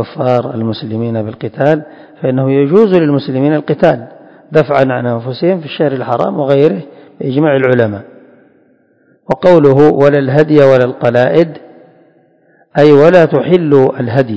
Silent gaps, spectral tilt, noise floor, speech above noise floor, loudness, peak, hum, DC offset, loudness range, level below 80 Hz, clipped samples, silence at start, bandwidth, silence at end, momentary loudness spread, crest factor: none; -9 dB/octave; -51 dBFS; 42 dB; -11 LUFS; 0 dBFS; none; under 0.1%; 4 LU; -50 dBFS; 2%; 0 s; 8 kHz; 0 s; 11 LU; 10 dB